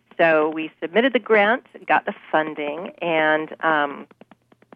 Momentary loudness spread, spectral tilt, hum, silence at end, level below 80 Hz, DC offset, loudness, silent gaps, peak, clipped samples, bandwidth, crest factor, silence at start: 11 LU; -7.5 dB/octave; none; 0.7 s; -78 dBFS; under 0.1%; -21 LUFS; none; -6 dBFS; under 0.1%; 5.4 kHz; 16 dB; 0.2 s